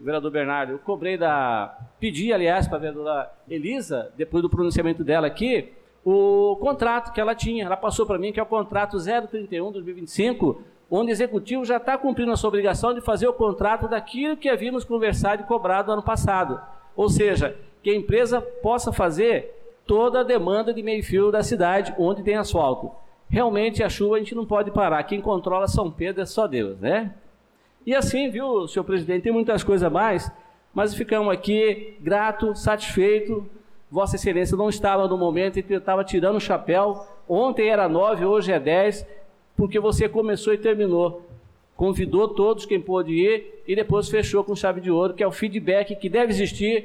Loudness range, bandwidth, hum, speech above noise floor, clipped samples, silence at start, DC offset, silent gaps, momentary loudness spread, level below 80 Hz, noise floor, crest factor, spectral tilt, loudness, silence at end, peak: 3 LU; 14.5 kHz; none; 37 dB; under 0.1%; 0 s; under 0.1%; none; 7 LU; -42 dBFS; -59 dBFS; 10 dB; -6 dB/octave; -23 LUFS; 0 s; -12 dBFS